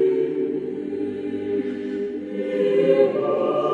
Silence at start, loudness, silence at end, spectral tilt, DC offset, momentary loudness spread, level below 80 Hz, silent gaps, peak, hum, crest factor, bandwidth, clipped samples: 0 s; -23 LUFS; 0 s; -8 dB/octave; under 0.1%; 10 LU; -66 dBFS; none; -6 dBFS; none; 16 dB; 4.7 kHz; under 0.1%